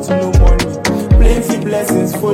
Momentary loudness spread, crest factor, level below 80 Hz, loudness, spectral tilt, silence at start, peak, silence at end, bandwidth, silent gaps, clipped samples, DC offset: 5 LU; 10 dB; -14 dBFS; -13 LUFS; -6 dB/octave; 0 s; 0 dBFS; 0 s; 15.5 kHz; none; under 0.1%; under 0.1%